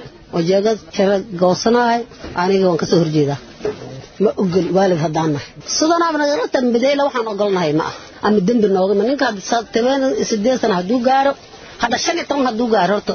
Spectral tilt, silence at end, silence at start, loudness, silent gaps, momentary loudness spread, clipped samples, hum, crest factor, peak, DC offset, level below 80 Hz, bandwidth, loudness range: -5 dB/octave; 0 s; 0 s; -17 LUFS; none; 7 LU; under 0.1%; none; 14 dB; -2 dBFS; under 0.1%; -50 dBFS; 6.8 kHz; 1 LU